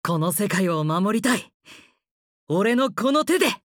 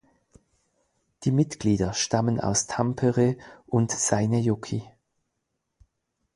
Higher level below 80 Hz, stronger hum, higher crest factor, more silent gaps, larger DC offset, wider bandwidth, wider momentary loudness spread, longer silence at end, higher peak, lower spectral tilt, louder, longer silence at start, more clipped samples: second, -68 dBFS vs -52 dBFS; neither; about the same, 16 dB vs 18 dB; first, 1.54-1.60 s, 2.11-2.47 s vs none; neither; first, over 20 kHz vs 11.5 kHz; second, 3 LU vs 7 LU; second, 0.15 s vs 1.5 s; about the same, -6 dBFS vs -8 dBFS; about the same, -5 dB/octave vs -5 dB/octave; first, -22 LUFS vs -25 LUFS; second, 0.05 s vs 1.2 s; neither